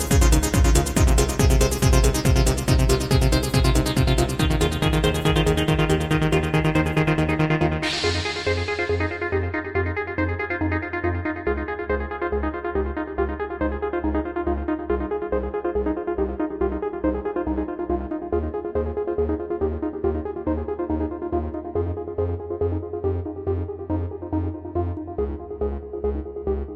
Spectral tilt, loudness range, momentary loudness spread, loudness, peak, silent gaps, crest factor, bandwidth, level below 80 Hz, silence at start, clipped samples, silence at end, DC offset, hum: -5.5 dB/octave; 7 LU; 8 LU; -23 LUFS; -4 dBFS; none; 18 dB; 16 kHz; -28 dBFS; 0 s; under 0.1%; 0 s; under 0.1%; none